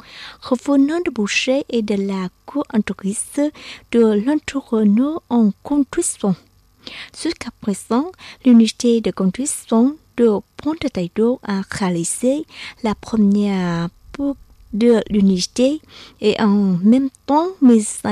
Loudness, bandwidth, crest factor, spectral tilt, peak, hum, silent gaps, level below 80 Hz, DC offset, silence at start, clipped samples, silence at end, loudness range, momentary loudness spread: -18 LUFS; 13.5 kHz; 14 dB; -5.5 dB/octave; -4 dBFS; none; none; -50 dBFS; under 0.1%; 0.1 s; under 0.1%; 0 s; 3 LU; 11 LU